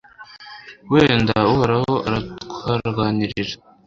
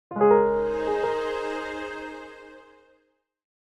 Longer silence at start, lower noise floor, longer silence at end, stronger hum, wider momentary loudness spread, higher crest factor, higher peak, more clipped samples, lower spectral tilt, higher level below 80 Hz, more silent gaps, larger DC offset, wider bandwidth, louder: about the same, 0.2 s vs 0.1 s; second, -42 dBFS vs -70 dBFS; second, 0.3 s vs 1 s; neither; about the same, 22 LU vs 21 LU; about the same, 20 dB vs 18 dB; first, 0 dBFS vs -8 dBFS; neither; about the same, -7 dB/octave vs -6 dB/octave; first, -44 dBFS vs -54 dBFS; neither; neither; second, 7.6 kHz vs 10 kHz; first, -19 LUFS vs -24 LUFS